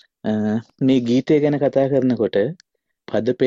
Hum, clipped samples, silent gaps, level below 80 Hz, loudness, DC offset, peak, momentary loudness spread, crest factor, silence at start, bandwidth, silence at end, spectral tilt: none; under 0.1%; none; -60 dBFS; -19 LUFS; under 0.1%; -6 dBFS; 7 LU; 14 dB; 0.25 s; 7.4 kHz; 0 s; -8 dB/octave